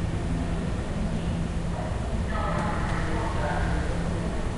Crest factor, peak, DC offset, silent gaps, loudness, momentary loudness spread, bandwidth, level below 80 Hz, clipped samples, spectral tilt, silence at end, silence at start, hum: 12 dB; -14 dBFS; under 0.1%; none; -29 LUFS; 3 LU; 11.5 kHz; -32 dBFS; under 0.1%; -6.5 dB/octave; 0 s; 0 s; none